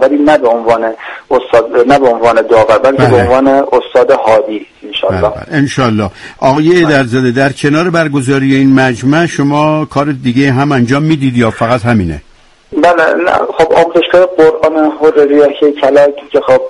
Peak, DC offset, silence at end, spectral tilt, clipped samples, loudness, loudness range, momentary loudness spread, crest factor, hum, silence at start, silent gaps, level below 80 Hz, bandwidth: 0 dBFS; under 0.1%; 0 s; -6.5 dB/octave; 0.3%; -9 LUFS; 3 LU; 6 LU; 8 dB; none; 0 s; none; -38 dBFS; 11.5 kHz